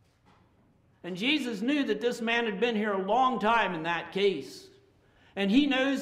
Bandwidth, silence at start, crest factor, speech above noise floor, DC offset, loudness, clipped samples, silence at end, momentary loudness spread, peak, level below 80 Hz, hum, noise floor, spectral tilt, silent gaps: 14.5 kHz; 1.05 s; 16 dB; 36 dB; under 0.1%; -28 LUFS; under 0.1%; 0 s; 14 LU; -12 dBFS; -62 dBFS; none; -64 dBFS; -5 dB/octave; none